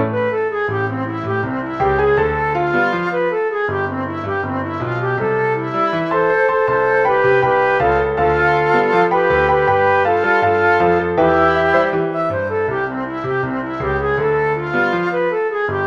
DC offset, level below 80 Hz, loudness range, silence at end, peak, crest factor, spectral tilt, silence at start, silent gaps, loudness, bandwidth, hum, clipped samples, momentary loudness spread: 0.1%; -40 dBFS; 5 LU; 0 s; -2 dBFS; 14 dB; -7.5 dB/octave; 0 s; none; -17 LUFS; 7 kHz; none; under 0.1%; 7 LU